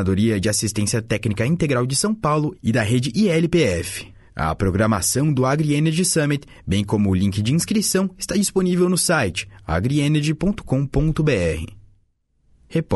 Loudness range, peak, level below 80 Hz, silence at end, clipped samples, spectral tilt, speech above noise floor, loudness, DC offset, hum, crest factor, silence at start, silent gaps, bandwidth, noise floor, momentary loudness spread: 1 LU; -6 dBFS; -40 dBFS; 0 s; under 0.1%; -5 dB/octave; 44 dB; -20 LUFS; under 0.1%; none; 14 dB; 0 s; none; 12 kHz; -63 dBFS; 7 LU